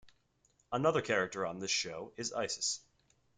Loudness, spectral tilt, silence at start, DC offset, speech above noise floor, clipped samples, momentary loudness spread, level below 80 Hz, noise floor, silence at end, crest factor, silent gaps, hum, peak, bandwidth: -35 LUFS; -2.5 dB/octave; 0.05 s; under 0.1%; 39 dB; under 0.1%; 9 LU; -72 dBFS; -74 dBFS; 0.6 s; 20 dB; none; none; -16 dBFS; 9.8 kHz